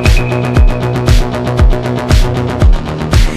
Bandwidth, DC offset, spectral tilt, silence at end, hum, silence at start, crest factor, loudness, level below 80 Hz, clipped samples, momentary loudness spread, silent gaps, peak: 13.5 kHz; under 0.1%; -6 dB/octave; 0 s; none; 0 s; 10 dB; -12 LUFS; -12 dBFS; 0.4%; 3 LU; none; 0 dBFS